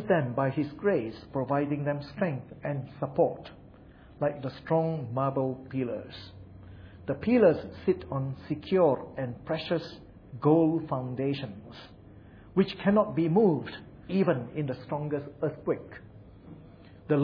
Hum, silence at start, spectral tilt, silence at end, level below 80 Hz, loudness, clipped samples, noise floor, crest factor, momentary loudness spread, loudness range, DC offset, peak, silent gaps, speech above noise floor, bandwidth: none; 0 s; -10 dB/octave; 0 s; -58 dBFS; -29 LUFS; under 0.1%; -52 dBFS; 20 dB; 23 LU; 4 LU; under 0.1%; -10 dBFS; none; 23 dB; 5.4 kHz